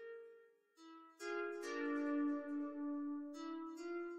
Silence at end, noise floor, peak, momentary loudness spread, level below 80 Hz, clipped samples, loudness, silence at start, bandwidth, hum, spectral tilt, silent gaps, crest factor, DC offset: 0 s; -67 dBFS; -30 dBFS; 20 LU; -88 dBFS; under 0.1%; -44 LUFS; 0 s; 10.5 kHz; none; -3 dB/octave; none; 14 dB; under 0.1%